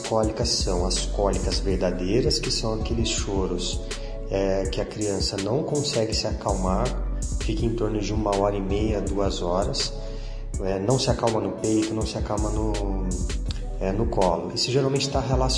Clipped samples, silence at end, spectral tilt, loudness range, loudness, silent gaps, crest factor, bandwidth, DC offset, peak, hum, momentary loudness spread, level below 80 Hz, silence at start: under 0.1%; 0 s; -5 dB/octave; 1 LU; -25 LUFS; none; 18 dB; 10.5 kHz; under 0.1%; -6 dBFS; none; 6 LU; -30 dBFS; 0 s